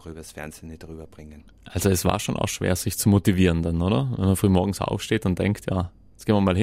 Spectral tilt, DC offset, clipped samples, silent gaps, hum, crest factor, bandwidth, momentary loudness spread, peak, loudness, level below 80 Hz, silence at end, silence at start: -6 dB/octave; under 0.1%; under 0.1%; none; none; 18 dB; 16 kHz; 19 LU; -4 dBFS; -23 LUFS; -42 dBFS; 0 s; 0.05 s